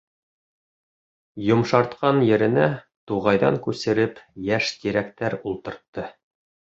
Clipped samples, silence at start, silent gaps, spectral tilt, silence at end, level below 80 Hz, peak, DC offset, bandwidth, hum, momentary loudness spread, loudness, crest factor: under 0.1%; 1.35 s; 2.96-3.07 s, 5.88-5.93 s; -6.5 dB/octave; 0.65 s; -58 dBFS; -2 dBFS; under 0.1%; 7.8 kHz; none; 16 LU; -22 LUFS; 22 dB